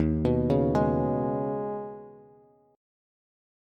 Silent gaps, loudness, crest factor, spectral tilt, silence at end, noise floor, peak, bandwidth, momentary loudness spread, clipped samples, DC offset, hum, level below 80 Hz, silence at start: none; -27 LUFS; 16 dB; -10 dB/octave; 1.55 s; -58 dBFS; -12 dBFS; 7.8 kHz; 13 LU; under 0.1%; under 0.1%; none; -44 dBFS; 0 s